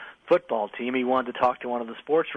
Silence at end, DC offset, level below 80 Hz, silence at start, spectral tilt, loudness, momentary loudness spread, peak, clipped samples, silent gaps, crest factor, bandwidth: 0 s; under 0.1%; -70 dBFS; 0 s; -6.5 dB/octave; -26 LUFS; 7 LU; -10 dBFS; under 0.1%; none; 16 dB; 6.2 kHz